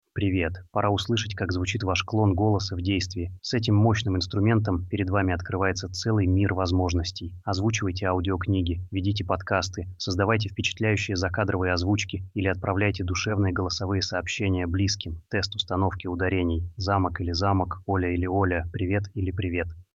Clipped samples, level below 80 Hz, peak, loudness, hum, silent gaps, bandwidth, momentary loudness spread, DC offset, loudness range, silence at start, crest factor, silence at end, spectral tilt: under 0.1%; -44 dBFS; -8 dBFS; -26 LUFS; none; none; 7.8 kHz; 6 LU; under 0.1%; 2 LU; 0.15 s; 18 dB; 0.15 s; -5.5 dB/octave